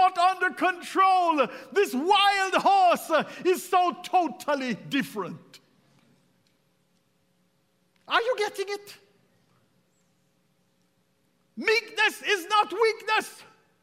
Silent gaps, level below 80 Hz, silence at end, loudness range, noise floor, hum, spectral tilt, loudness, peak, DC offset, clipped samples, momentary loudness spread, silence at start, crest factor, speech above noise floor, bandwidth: none; -78 dBFS; 0.4 s; 13 LU; -70 dBFS; none; -3 dB/octave; -24 LUFS; -8 dBFS; under 0.1%; under 0.1%; 11 LU; 0 s; 18 dB; 45 dB; 16 kHz